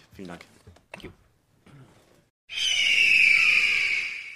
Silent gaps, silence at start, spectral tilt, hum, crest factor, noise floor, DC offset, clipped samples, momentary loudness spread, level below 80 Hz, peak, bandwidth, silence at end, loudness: 2.30-2.48 s; 0.2 s; 0.5 dB/octave; none; 18 dB; -63 dBFS; under 0.1%; under 0.1%; 13 LU; -62 dBFS; -8 dBFS; 14 kHz; 0 s; -19 LUFS